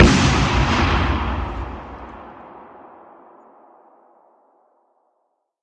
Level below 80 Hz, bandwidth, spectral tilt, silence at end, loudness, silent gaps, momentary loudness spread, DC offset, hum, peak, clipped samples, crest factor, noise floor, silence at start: -28 dBFS; 10 kHz; -5 dB/octave; 3 s; -19 LUFS; none; 25 LU; under 0.1%; none; 0 dBFS; under 0.1%; 22 dB; -71 dBFS; 0 s